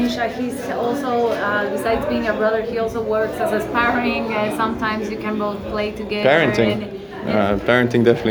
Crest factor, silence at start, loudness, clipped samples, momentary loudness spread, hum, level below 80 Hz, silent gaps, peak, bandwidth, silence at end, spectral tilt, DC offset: 18 dB; 0 s; -20 LUFS; under 0.1%; 8 LU; none; -44 dBFS; none; 0 dBFS; over 20 kHz; 0 s; -6 dB/octave; under 0.1%